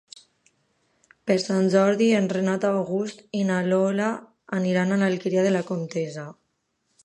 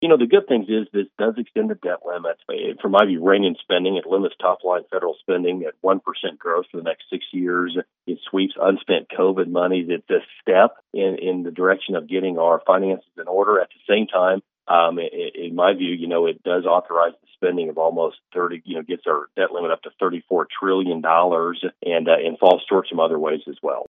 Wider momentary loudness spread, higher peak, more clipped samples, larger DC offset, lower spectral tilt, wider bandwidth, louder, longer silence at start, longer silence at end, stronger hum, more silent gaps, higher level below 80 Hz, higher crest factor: about the same, 11 LU vs 10 LU; second, -8 dBFS vs 0 dBFS; neither; neither; second, -6.5 dB/octave vs -8 dB/octave; first, 10.5 kHz vs 3.9 kHz; about the same, -23 LUFS vs -21 LUFS; first, 1.25 s vs 0 s; first, 0.7 s vs 0.05 s; neither; neither; first, -72 dBFS vs -82 dBFS; about the same, 18 dB vs 20 dB